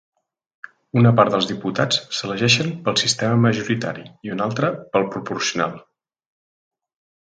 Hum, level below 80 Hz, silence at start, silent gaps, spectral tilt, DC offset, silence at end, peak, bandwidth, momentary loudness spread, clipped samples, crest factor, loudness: none; -60 dBFS; 0.95 s; none; -4.5 dB/octave; under 0.1%; 1.4 s; 0 dBFS; 9.4 kHz; 9 LU; under 0.1%; 20 dB; -20 LUFS